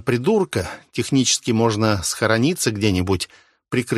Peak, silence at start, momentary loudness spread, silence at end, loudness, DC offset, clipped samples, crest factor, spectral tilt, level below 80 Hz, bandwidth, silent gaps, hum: -2 dBFS; 0.05 s; 8 LU; 0 s; -20 LUFS; under 0.1%; under 0.1%; 18 dB; -4.5 dB/octave; -48 dBFS; 13 kHz; none; none